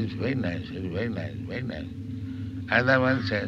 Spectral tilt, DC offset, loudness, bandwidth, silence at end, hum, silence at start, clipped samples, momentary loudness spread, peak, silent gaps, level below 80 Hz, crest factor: -7.5 dB/octave; under 0.1%; -28 LUFS; 7.4 kHz; 0 s; none; 0 s; under 0.1%; 14 LU; -6 dBFS; none; -50 dBFS; 20 dB